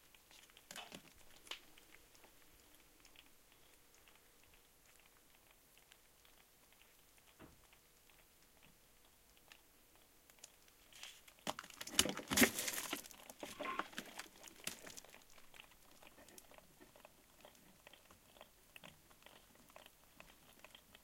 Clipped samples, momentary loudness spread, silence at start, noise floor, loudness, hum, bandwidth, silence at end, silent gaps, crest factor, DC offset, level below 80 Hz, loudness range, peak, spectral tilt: under 0.1%; 24 LU; 0.15 s; -68 dBFS; -42 LUFS; none; 16.5 kHz; 0.05 s; none; 36 dB; under 0.1%; -72 dBFS; 26 LU; -14 dBFS; -1.5 dB/octave